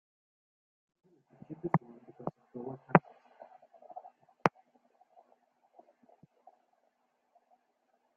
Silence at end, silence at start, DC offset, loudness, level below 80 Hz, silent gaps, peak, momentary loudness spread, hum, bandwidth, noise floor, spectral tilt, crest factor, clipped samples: 3.7 s; 1.5 s; under 0.1%; -33 LUFS; -76 dBFS; none; -2 dBFS; 28 LU; none; 6.8 kHz; -77 dBFS; -6.5 dB/octave; 36 dB; under 0.1%